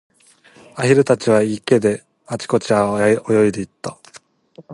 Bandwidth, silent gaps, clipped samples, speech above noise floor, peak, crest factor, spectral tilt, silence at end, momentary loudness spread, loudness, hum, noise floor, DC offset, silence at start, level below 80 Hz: 11.5 kHz; none; under 0.1%; 34 dB; 0 dBFS; 18 dB; -6 dB/octave; 0 s; 15 LU; -17 LUFS; none; -50 dBFS; under 0.1%; 0.75 s; -56 dBFS